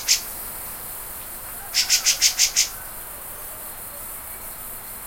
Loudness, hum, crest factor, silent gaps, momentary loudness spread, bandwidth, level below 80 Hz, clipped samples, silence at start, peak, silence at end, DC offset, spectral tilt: -23 LUFS; none; 24 dB; none; 16 LU; 16.5 kHz; -48 dBFS; under 0.1%; 0 s; -2 dBFS; 0 s; under 0.1%; 2 dB/octave